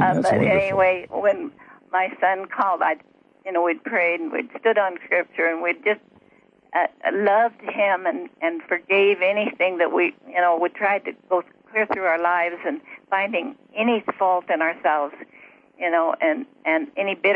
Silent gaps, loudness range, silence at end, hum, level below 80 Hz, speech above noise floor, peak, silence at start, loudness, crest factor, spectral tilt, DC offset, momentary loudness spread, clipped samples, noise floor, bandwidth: none; 3 LU; 0 s; none; -66 dBFS; 35 dB; -8 dBFS; 0 s; -22 LUFS; 14 dB; -6.5 dB/octave; under 0.1%; 8 LU; under 0.1%; -56 dBFS; 10.5 kHz